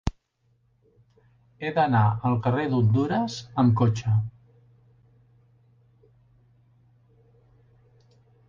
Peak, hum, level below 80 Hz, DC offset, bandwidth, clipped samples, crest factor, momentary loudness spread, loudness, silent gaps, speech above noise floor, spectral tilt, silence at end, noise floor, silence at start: -8 dBFS; none; -50 dBFS; under 0.1%; 7.2 kHz; under 0.1%; 20 dB; 9 LU; -24 LUFS; none; 46 dB; -8 dB/octave; 4.2 s; -68 dBFS; 0.05 s